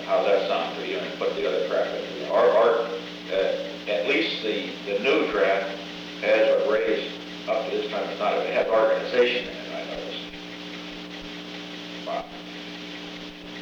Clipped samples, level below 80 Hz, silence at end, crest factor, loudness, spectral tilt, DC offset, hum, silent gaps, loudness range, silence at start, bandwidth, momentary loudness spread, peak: under 0.1%; -60 dBFS; 0 s; 16 dB; -25 LUFS; -4.5 dB/octave; under 0.1%; 60 Hz at -65 dBFS; none; 11 LU; 0 s; 8.4 kHz; 15 LU; -8 dBFS